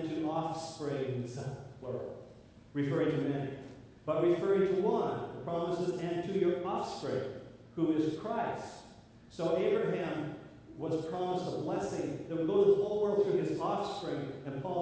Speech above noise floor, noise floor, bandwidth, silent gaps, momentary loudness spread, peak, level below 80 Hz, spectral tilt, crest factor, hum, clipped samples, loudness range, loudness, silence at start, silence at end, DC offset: 23 dB; -55 dBFS; 8 kHz; none; 14 LU; -16 dBFS; -66 dBFS; -7 dB/octave; 18 dB; none; under 0.1%; 5 LU; -34 LUFS; 0 s; 0 s; under 0.1%